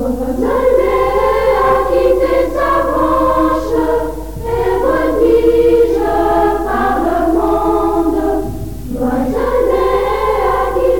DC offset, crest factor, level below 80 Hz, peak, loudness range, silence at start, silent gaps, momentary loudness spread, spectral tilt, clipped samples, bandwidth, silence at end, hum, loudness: 3%; 12 dB; -28 dBFS; 0 dBFS; 2 LU; 0 s; none; 7 LU; -6.5 dB/octave; under 0.1%; 18 kHz; 0 s; none; -13 LUFS